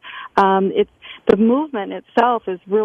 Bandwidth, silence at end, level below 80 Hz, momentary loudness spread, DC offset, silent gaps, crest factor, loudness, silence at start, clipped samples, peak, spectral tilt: 7.4 kHz; 0 s; -54 dBFS; 9 LU; under 0.1%; none; 16 dB; -18 LUFS; 0.05 s; under 0.1%; -2 dBFS; -7.5 dB/octave